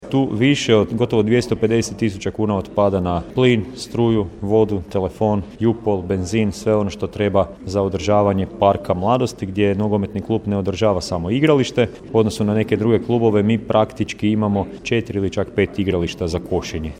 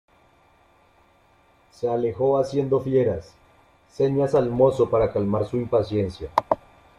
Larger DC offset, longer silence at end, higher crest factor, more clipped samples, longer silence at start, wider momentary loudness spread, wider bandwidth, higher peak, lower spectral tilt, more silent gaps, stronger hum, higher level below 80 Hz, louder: neither; second, 0 s vs 0.4 s; about the same, 18 dB vs 22 dB; neither; second, 0 s vs 1.8 s; about the same, 6 LU vs 7 LU; first, 14 kHz vs 11 kHz; about the same, 0 dBFS vs -2 dBFS; second, -6.5 dB/octave vs -8.5 dB/octave; neither; neither; first, -42 dBFS vs -50 dBFS; first, -19 LUFS vs -23 LUFS